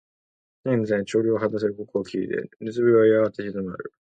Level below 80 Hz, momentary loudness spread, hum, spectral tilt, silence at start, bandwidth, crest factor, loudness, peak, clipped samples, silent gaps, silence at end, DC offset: -62 dBFS; 14 LU; none; -7.5 dB/octave; 0.65 s; 8.8 kHz; 16 dB; -23 LUFS; -6 dBFS; under 0.1%; none; 0.15 s; under 0.1%